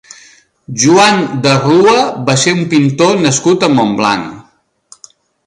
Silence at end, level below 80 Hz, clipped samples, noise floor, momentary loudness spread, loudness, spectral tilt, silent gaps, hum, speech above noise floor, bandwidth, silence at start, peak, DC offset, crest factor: 1.05 s; -50 dBFS; under 0.1%; -52 dBFS; 6 LU; -10 LUFS; -4.5 dB/octave; none; none; 42 dB; 11.5 kHz; 0.7 s; 0 dBFS; under 0.1%; 12 dB